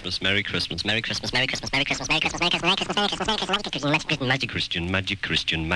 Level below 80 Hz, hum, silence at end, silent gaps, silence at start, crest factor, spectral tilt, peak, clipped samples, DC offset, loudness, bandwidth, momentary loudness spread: -46 dBFS; none; 0 s; none; 0 s; 18 dB; -3.5 dB/octave; -8 dBFS; under 0.1%; under 0.1%; -23 LUFS; 11 kHz; 4 LU